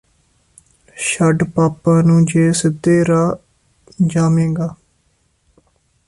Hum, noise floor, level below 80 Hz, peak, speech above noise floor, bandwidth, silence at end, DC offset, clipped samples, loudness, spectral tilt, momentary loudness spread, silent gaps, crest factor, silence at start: none; -61 dBFS; -48 dBFS; -4 dBFS; 47 dB; 11.5 kHz; 1.35 s; under 0.1%; under 0.1%; -15 LUFS; -6.5 dB/octave; 9 LU; none; 14 dB; 0.95 s